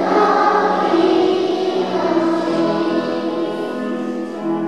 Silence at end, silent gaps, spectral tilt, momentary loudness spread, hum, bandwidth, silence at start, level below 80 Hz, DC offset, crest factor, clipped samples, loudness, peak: 0 s; none; -6 dB/octave; 9 LU; none; 10 kHz; 0 s; -70 dBFS; 0.4%; 14 dB; under 0.1%; -17 LUFS; -2 dBFS